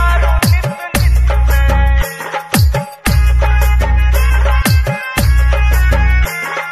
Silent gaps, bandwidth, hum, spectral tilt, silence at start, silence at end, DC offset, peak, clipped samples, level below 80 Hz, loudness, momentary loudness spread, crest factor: none; 15.5 kHz; none; -5 dB/octave; 0 s; 0 s; under 0.1%; 0 dBFS; under 0.1%; -12 dBFS; -13 LUFS; 4 LU; 10 dB